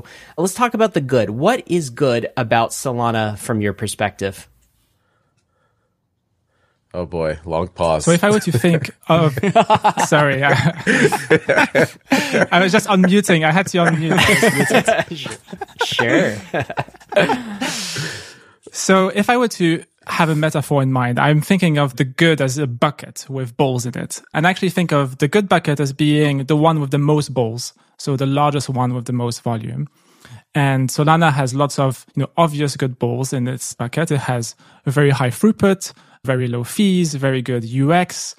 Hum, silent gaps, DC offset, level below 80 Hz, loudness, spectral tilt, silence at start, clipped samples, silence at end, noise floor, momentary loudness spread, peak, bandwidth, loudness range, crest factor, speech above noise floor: none; none; under 0.1%; -50 dBFS; -17 LUFS; -5.5 dB/octave; 0.1 s; under 0.1%; 0.05 s; -68 dBFS; 10 LU; -2 dBFS; 15.5 kHz; 7 LU; 16 dB; 52 dB